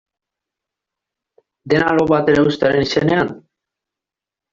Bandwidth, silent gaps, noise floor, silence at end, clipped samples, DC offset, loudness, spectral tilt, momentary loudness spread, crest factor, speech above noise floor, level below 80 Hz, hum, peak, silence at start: 7.6 kHz; none; -87 dBFS; 1.15 s; under 0.1%; under 0.1%; -16 LUFS; -6.5 dB/octave; 5 LU; 16 dB; 72 dB; -50 dBFS; none; -2 dBFS; 1.65 s